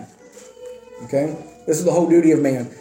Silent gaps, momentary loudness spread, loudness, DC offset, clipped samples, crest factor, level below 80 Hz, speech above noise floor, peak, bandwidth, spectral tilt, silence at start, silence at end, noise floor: none; 24 LU; -18 LUFS; under 0.1%; under 0.1%; 14 dB; -64 dBFS; 26 dB; -4 dBFS; 16.5 kHz; -6.5 dB/octave; 0 s; 0.05 s; -44 dBFS